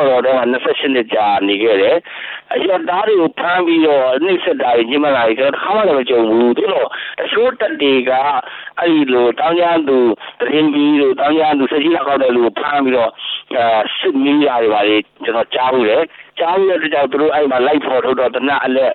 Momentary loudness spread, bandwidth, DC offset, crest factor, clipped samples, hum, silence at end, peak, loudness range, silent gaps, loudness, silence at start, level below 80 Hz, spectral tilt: 5 LU; 4.4 kHz; under 0.1%; 12 dB; under 0.1%; none; 0 s; -2 dBFS; 1 LU; none; -14 LUFS; 0 s; -58 dBFS; -8 dB/octave